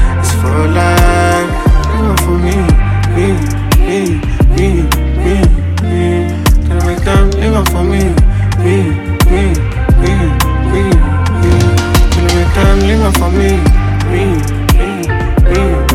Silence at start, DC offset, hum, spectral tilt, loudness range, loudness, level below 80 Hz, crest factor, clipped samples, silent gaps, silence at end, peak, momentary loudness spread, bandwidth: 0 s; under 0.1%; none; -6 dB/octave; 1 LU; -11 LUFS; -12 dBFS; 10 dB; under 0.1%; none; 0 s; 0 dBFS; 3 LU; 16 kHz